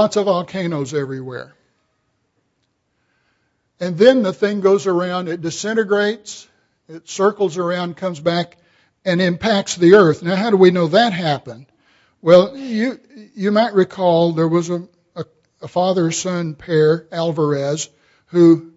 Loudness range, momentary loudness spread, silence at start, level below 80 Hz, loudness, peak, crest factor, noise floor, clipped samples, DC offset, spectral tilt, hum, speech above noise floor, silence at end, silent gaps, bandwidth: 6 LU; 17 LU; 0 s; -60 dBFS; -17 LUFS; 0 dBFS; 18 dB; -68 dBFS; under 0.1%; under 0.1%; -5.5 dB/octave; none; 52 dB; 0.05 s; none; 8 kHz